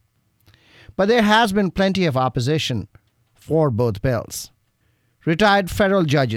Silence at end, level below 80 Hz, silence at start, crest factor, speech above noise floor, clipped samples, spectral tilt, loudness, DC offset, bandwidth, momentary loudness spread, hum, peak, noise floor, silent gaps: 0 s; -44 dBFS; 1 s; 16 dB; 46 dB; under 0.1%; -5.5 dB/octave; -19 LUFS; under 0.1%; 17 kHz; 13 LU; none; -4 dBFS; -64 dBFS; none